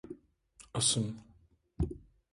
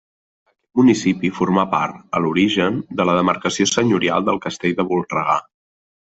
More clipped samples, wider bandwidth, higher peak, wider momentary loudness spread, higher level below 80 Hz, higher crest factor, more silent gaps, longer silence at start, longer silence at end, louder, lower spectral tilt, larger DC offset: neither; first, 11.5 kHz vs 8.2 kHz; second, -14 dBFS vs 0 dBFS; first, 22 LU vs 6 LU; first, -48 dBFS vs -56 dBFS; about the same, 22 dB vs 18 dB; neither; second, 0.05 s vs 0.75 s; second, 0.3 s vs 0.75 s; second, -33 LUFS vs -18 LUFS; second, -3.5 dB/octave vs -5 dB/octave; neither